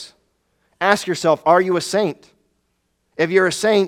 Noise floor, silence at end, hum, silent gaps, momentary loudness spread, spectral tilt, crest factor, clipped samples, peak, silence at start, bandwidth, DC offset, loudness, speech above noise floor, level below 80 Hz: -69 dBFS; 0 s; none; none; 17 LU; -4 dB/octave; 20 dB; under 0.1%; 0 dBFS; 0 s; 16 kHz; under 0.1%; -18 LUFS; 52 dB; -64 dBFS